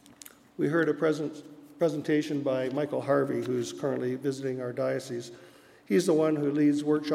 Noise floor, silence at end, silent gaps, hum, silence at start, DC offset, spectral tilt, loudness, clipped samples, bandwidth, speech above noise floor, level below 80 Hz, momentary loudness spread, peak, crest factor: -52 dBFS; 0 s; none; none; 0.6 s; under 0.1%; -6.5 dB/octave; -29 LUFS; under 0.1%; 15 kHz; 25 dB; -78 dBFS; 13 LU; -12 dBFS; 16 dB